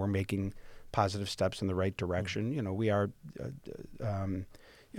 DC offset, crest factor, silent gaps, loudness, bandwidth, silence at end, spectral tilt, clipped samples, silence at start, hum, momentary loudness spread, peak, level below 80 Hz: under 0.1%; 22 dB; none; -35 LUFS; 15 kHz; 0 s; -6.5 dB/octave; under 0.1%; 0 s; none; 12 LU; -12 dBFS; -56 dBFS